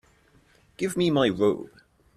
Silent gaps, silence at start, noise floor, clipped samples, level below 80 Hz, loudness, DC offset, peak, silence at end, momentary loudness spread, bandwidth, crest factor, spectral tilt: none; 0.8 s; -60 dBFS; under 0.1%; -60 dBFS; -25 LUFS; under 0.1%; -8 dBFS; 0.5 s; 12 LU; 13.5 kHz; 20 dB; -5.5 dB/octave